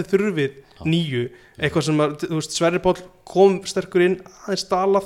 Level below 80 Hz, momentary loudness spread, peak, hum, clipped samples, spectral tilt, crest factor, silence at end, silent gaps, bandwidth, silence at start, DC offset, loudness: -52 dBFS; 10 LU; -4 dBFS; none; under 0.1%; -5.5 dB/octave; 18 dB; 0 s; none; 13.5 kHz; 0 s; under 0.1%; -21 LUFS